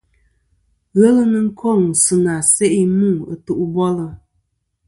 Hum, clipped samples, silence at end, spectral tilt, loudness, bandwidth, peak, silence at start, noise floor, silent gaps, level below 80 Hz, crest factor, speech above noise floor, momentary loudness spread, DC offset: none; under 0.1%; 0.7 s; -5.5 dB/octave; -15 LUFS; 11.5 kHz; 0 dBFS; 0.95 s; -67 dBFS; none; -52 dBFS; 16 dB; 52 dB; 10 LU; under 0.1%